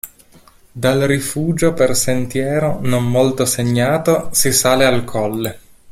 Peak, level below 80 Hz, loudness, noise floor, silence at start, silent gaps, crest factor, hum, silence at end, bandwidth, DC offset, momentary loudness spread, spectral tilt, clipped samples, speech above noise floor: 0 dBFS; -42 dBFS; -16 LUFS; -47 dBFS; 0.05 s; none; 16 dB; none; 0.3 s; 16.5 kHz; under 0.1%; 7 LU; -4.5 dB/octave; under 0.1%; 32 dB